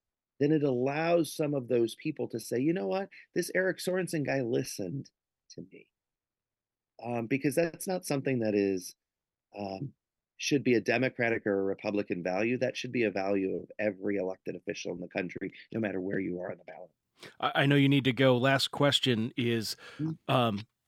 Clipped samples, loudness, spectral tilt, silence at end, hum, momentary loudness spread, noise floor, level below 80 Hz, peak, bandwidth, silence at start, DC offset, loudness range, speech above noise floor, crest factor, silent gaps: under 0.1%; -30 LUFS; -5.5 dB/octave; 0.25 s; none; 13 LU; under -90 dBFS; -74 dBFS; -10 dBFS; 16 kHz; 0.4 s; under 0.1%; 9 LU; over 60 dB; 20 dB; none